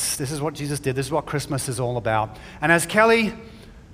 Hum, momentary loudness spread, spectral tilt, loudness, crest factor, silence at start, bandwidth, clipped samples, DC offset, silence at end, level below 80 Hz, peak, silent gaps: none; 10 LU; -4 dB/octave; -22 LUFS; 22 dB; 0 s; 16 kHz; under 0.1%; under 0.1%; 0 s; -48 dBFS; 0 dBFS; none